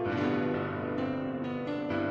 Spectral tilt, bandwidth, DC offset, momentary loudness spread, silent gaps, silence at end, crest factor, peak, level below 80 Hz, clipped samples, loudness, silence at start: -8.5 dB/octave; 6.8 kHz; under 0.1%; 5 LU; none; 0 s; 14 dB; -18 dBFS; -62 dBFS; under 0.1%; -32 LUFS; 0 s